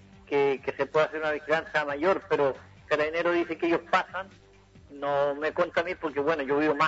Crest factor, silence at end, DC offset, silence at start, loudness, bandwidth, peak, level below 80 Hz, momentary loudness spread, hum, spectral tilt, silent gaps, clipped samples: 18 dB; 0 s; under 0.1%; 0.3 s; -27 LUFS; 8 kHz; -10 dBFS; -62 dBFS; 5 LU; none; -5.5 dB/octave; none; under 0.1%